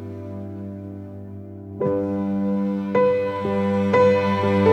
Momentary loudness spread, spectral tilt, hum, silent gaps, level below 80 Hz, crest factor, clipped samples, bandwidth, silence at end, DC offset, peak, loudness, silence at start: 19 LU; -8.5 dB/octave; none; none; -60 dBFS; 16 dB; under 0.1%; 8.2 kHz; 0 s; under 0.1%; -4 dBFS; -21 LUFS; 0 s